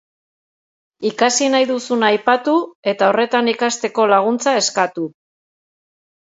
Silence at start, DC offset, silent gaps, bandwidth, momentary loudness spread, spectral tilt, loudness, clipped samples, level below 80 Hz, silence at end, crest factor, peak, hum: 1 s; under 0.1%; 2.75-2.83 s; 8 kHz; 8 LU; -2.5 dB/octave; -16 LUFS; under 0.1%; -72 dBFS; 1.25 s; 18 dB; 0 dBFS; none